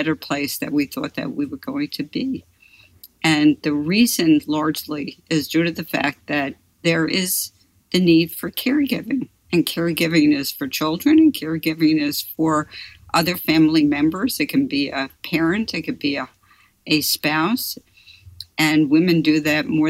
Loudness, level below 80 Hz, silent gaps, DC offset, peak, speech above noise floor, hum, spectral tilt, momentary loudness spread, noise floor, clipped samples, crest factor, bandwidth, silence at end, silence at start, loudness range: -20 LUFS; -56 dBFS; none; under 0.1%; -6 dBFS; 37 dB; none; -4.5 dB/octave; 11 LU; -56 dBFS; under 0.1%; 14 dB; 16.5 kHz; 0 s; 0 s; 3 LU